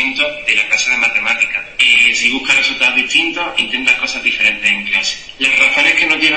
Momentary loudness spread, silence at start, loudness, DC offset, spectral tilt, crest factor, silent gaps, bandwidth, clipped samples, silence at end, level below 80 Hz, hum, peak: 7 LU; 0 s; -11 LUFS; 0.5%; 0 dB/octave; 14 dB; none; 8.8 kHz; under 0.1%; 0 s; -46 dBFS; none; 0 dBFS